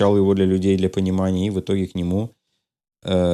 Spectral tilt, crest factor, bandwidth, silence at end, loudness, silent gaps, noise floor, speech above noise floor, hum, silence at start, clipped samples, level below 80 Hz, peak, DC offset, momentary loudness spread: -8 dB/octave; 14 dB; 10.5 kHz; 0 s; -20 LUFS; none; -76 dBFS; 57 dB; none; 0 s; under 0.1%; -54 dBFS; -6 dBFS; under 0.1%; 8 LU